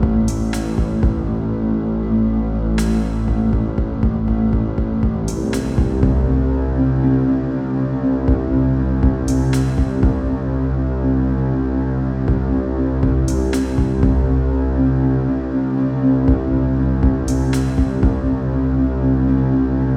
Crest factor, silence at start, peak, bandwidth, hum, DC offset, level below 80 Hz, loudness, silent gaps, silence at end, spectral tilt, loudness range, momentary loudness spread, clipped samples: 14 dB; 0 s; -2 dBFS; 11.5 kHz; none; under 0.1%; -22 dBFS; -18 LUFS; none; 0 s; -8.5 dB/octave; 2 LU; 4 LU; under 0.1%